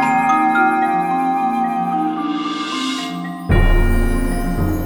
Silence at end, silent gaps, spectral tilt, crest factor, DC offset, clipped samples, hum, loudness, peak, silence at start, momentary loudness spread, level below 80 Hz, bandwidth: 0 s; none; -6 dB/octave; 14 dB; under 0.1%; under 0.1%; none; -18 LUFS; -2 dBFS; 0 s; 7 LU; -22 dBFS; over 20 kHz